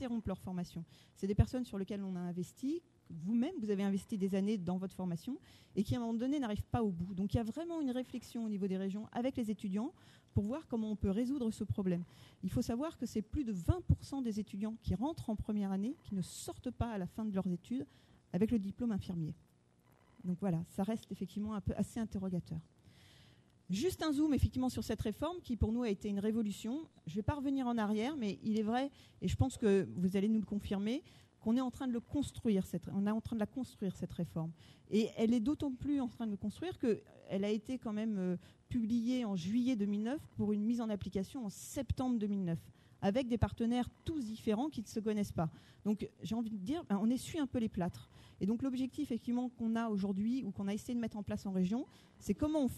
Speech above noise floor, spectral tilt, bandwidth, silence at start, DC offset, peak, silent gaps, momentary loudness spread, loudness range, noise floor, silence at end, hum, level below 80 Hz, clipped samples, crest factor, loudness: 32 dB; -7 dB/octave; 13 kHz; 0 s; under 0.1%; -16 dBFS; none; 8 LU; 4 LU; -69 dBFS; 0 s; none; -54 dBFS; under 0.1%; 22 dB; -38 LUFS